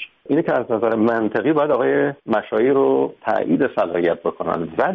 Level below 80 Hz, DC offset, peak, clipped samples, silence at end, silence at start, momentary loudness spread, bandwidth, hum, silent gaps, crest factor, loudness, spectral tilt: -60 dBFS; under 0.1%; -6 dBFS; under 0.1%; 0 s; 0 s; 6 LU; 5.4 kHz; none; none; 14 dB; -19 LUFS; -5.5 dB/octave